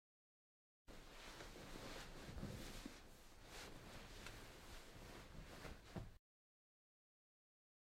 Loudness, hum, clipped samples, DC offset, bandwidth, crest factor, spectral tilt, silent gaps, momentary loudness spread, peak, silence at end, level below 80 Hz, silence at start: -57 LUFS; none; under 0.1%; under 0.1%; 16 kHz; 20 dB; -4 dB/octave; none; 8 LU; -38 dBFS; 1.85 s; -64 dBFS; 0.85 s